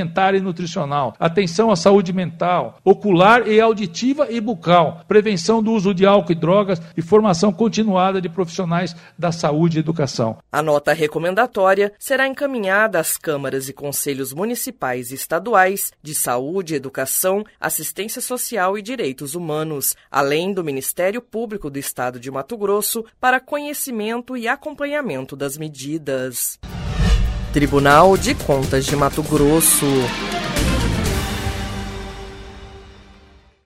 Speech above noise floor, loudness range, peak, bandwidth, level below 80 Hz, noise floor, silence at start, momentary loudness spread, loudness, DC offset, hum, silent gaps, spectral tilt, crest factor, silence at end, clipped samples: 30 dB; 6 LU; 0 dBFS; 16 kHz; -34 dBFS; -49 dBFS; 0 s; 11 LU; -18 LUFS; under 0.1%; none; none; -4.5 dB/octave; 18 dB; 0.65 s; under 0.1%